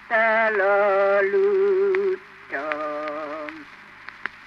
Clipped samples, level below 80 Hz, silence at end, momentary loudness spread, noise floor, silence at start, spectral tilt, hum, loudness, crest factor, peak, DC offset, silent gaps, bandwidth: under 0.1%; -68 dBFS; 0.05 s; 16 LU; -44 dBFS; 0 s; -6 dB/octave; 50 Hz at -65 dBFS; -21 LUFS; 16 dB; -6 dBFS; under 0.1%; none; 6.2 kHz